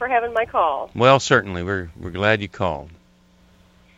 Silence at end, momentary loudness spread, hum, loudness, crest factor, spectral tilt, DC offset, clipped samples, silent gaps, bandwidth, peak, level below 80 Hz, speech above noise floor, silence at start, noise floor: 1.05 s; 11 LU; none; -20 LUFS; 22 dB; -5 dB/octave; under 0.1%; under 0.1%; none; 8 kHz; 0 dBFS; -48 dBFS; 34 dB; 0 s; -55 dBFS